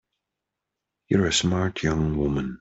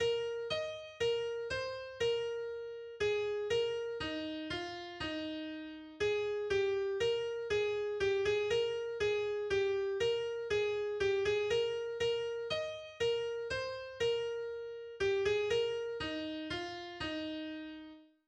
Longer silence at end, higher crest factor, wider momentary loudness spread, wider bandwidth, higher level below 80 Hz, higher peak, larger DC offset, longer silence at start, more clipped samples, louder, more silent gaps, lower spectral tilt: second, 0.05 s vs 0.25 s; about the same, 18 dB vs 14 dB; second, 4 LU vs 10 LU; second, 8.2 kHz vs 9.6 kHz; first, -42 dBFS vs -62 dBFS; first, -8 dBFS vs -22 dBFS; neither; first, 1.1 s vs 0 s; neither; first, -24 LUFS vs -36 LUFS; neither; about the same, -5 dB/octave vs -4 dB/octave